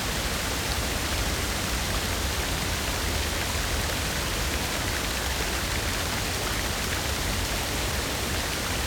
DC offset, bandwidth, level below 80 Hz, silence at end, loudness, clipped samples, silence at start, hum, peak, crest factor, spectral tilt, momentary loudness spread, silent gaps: under 0.1%; over 20 kHz; -34 dBFS; 0 s; -27 LUFS; under 0.1%; 0 s; none; -10 dBFS; 18 dB; -3 dB/octave; 0 LU; none